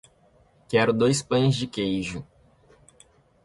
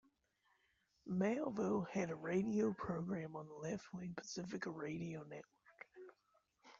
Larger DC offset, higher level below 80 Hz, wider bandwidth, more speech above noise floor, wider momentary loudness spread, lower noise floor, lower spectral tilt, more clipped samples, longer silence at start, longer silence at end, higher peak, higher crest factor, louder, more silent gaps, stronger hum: neither; first, -56 dBFS vs -76 dBFS; first, 11.5 kHz vs 7.6 kHz; about the same, 37 dB vs 38 dB; second, 10 LU vs 19 LU; second, -60 dBFS vs -80 dBFS; about the same, -5.5 dB/octave vs -6.5 dB/octave; neither; second, 0.7 s vs 1.05 s; first, 1.2 s vs 0.05 s; first, -8 dBFS vs -26 dBFS; about the same, 18 dB vs 18 dB; first, -24 LUFS vs -43 LUFS; neither; neither